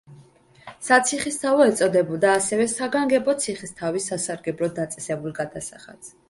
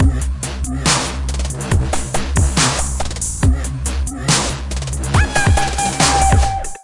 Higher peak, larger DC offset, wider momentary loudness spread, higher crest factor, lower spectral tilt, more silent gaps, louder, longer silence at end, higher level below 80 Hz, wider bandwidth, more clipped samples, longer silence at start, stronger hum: about the same, -2 dBFS vs -2 dBFS; neither; first, 12 LU vs 8 LU; about the same, 20 dB vs 16 dB; about the same, -3.5 dB/octave vs -3.5 dB/octave; neither; second, -22 LUFS vs -17 LUFS; first, 0.2 s vs 0 s; second, -62 dBFS vs -22 dBFS; about the same, 11.5 kHz vs 11.5 kHz; neither; about the same, 0.1 s vs 0 s; neither